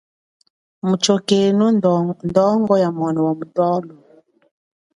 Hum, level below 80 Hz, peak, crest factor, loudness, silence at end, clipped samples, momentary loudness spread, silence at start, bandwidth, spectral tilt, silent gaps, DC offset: none; -60 dBFS; -2 dBFS; 18 dB; -17 LUFS; 1.05 s; under 0.1%; 5 LU; 0.85 s; 11.5 kHz; -6 dB/octave; none; under 0.1%